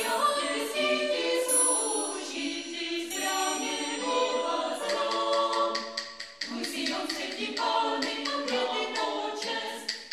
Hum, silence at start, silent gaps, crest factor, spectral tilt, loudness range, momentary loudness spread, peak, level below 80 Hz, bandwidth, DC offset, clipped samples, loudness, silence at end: none; 0 s; none; 18 dB; 0 dB/octave; 3 LU; 7 LU; -12 dBFS; -76 dBFS; 15.5 kHz; under 0.1%; under 0.1%; -29 LUFS; 0 s